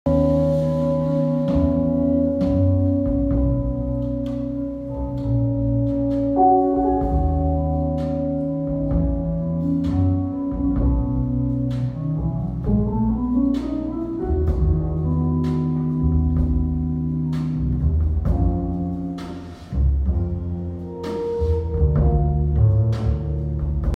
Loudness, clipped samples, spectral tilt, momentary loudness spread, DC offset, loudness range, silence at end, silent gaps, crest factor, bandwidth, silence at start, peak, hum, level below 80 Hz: -22 LUFS; under 0.1%; -11 dB/octave; 7 LU; under 0.1%; 3 LU; 0 s; none; 14 dB; 5.8 kHz; 0.05 s; -6 dBFS; none; -26 dBFS